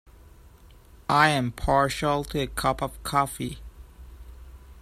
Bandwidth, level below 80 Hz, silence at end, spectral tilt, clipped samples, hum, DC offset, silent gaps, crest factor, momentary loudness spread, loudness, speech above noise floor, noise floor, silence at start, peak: 15 kHz; -42 dBFS; 0 s; -4.5 dB/octave; under 0.1%; none; under 0.1%; none; 22 dB; 14 LU; -25 LUFS; 26 dB; -51 dBFS; 0.65 s; -4 dBFS